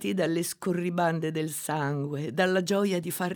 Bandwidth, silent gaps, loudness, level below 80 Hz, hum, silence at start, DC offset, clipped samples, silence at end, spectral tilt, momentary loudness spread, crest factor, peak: over 20 kHz; none; -28 LUFS; -74 dBFS; none; 0 s; under 0.1%; under 0.1%; 0 s; -5 dB/octave; 5 LU; 16 dB; -12 dBFS